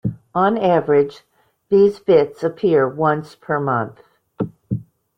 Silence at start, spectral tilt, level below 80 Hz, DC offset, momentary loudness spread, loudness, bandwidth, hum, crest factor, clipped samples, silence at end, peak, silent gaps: 0.05 s; -8.5 dB/octave; -56 dBFS; under 0.1%; 13 LU; -18 LUFS; 6.2 kHz; none; 16 dB; under 0.1%; 0.35 s; -2 dBFS; none